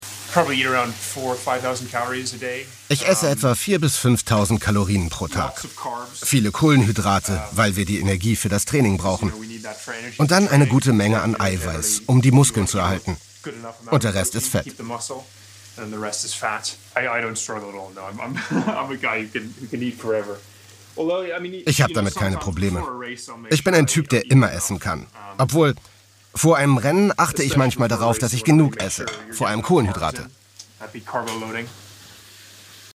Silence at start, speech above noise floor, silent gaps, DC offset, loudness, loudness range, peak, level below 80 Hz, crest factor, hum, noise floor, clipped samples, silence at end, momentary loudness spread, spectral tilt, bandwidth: 0 s; 24 dB; none; under 0.1%; -20 LUFS; 7 LU; 0 dBFS; -46 dBFS; 20 dB; none; -45 dBFS; under 0.1%; 0.05 s; 15 LU; -5 dB/octave; 16 kHz